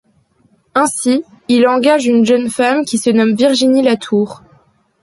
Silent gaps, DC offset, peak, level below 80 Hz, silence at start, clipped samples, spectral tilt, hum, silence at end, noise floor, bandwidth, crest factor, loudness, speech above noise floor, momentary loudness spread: none; under 0.1%; -2 dBFS; -60 dBFS; 0.75 s; under 0.1%; -4 dB/octave; none; 0.65 s; -55 dBFS; 11.5 kHz; 12 dB; -13 LUFS; 43 dB; 6 LU